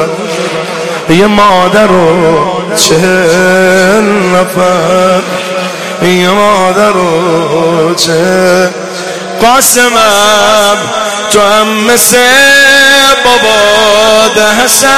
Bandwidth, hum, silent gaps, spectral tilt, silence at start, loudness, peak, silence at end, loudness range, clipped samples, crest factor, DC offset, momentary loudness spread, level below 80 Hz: 16 kHz; none; none; -3 dB/octave; 0 s; -6 LUFS; 0 dBFS; 0 s; 4 LU; 2%; 6 dB; 2%; 10 LU; -40 dBFS